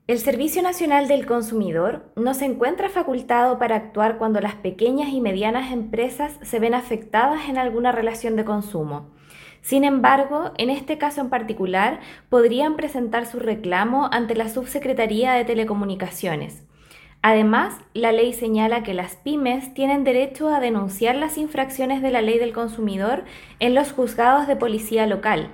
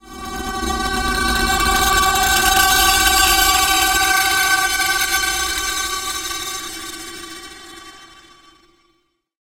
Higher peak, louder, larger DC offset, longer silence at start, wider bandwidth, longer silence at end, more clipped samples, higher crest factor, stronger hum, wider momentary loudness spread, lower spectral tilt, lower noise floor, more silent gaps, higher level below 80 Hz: about the same, -2 dBFS vs 0 dBFS; second, -21 LUFS vs -15 LUFS; neither; about the same, 0.1 s vs 0.05 s; about the same, 17 kHz vs 17 kHz; second, 0 s vs 1.4 s; neither; about the same, 20 dB vs 18 dB; neither; second, 8 LU vs 18 LU; first, -5 dB/octave vs -0.5 dB/octave; second, -49 dBFS vs -65 dBFS; neither; second, -52 dBFS vs -32 dBFS